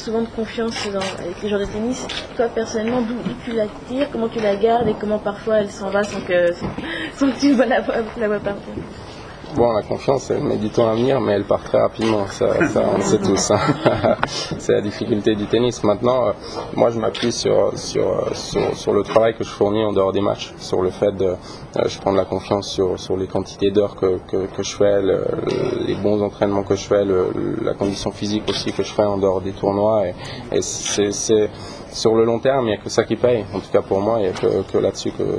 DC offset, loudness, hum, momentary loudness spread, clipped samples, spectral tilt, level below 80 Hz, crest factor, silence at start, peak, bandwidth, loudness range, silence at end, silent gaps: under 0.1%; -20 LUFS; none; 7 LU; under 0.1%; -5 dB/octave; -44 dBFS; 18 dB; 0 s; 0 dBFS; 10.5 kHz; 3 LU; 0 s; none